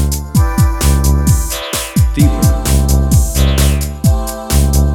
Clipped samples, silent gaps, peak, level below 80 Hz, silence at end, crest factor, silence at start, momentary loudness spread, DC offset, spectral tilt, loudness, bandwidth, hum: under 0.1%; none; 0 dBFS; -14 dBFS; 0 s; 12 dB; 0 s; 4 LU; under 0.1%; -5 dB/octave; -13 LUFS; 17.5 kHz; none